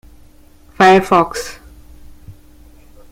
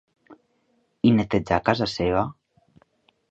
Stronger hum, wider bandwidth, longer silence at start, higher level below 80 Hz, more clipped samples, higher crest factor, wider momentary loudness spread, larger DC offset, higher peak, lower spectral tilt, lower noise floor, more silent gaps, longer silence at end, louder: neither; first, 16 kHz vs 8 kHz; first, 0.8 s vs 0.3 s; first, -42 dBFS vs -48 dBFS; neither; about the same, 18 dB vs 22 dB; first, 17 LU vs 5 LU; neither; about the same, 0 dBFS vs -2 dBFS; second, -5 dB/octave vs -7 dB/octave; second, -44 dBFS vs -68 dBFS; neither; second, 0.8 s vs 1 s; first, -12 LUFS vs -23 LUFS